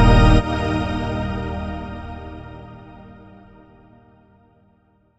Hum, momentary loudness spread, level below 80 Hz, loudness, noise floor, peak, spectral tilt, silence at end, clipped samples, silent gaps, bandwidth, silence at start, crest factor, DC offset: none; 26 LU; -26 dBFS; -21 LUFS; -59 dBFS; -4 dBFS; -7 dB/octave; 2.05 s; under 0.1%; none; 8 kHz; 0 s; 18 dB; under 0.1%